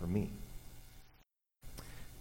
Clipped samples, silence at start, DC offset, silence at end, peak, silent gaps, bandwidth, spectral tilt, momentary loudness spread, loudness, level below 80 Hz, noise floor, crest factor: under 0.1%; 0 s; under 0.1%; 0 s; -22 dBFS; none; 17 kHz; -7 dB/octave; 23 LU; -45 LUFS; -52 dBFS; -70 dBFS; 20 dB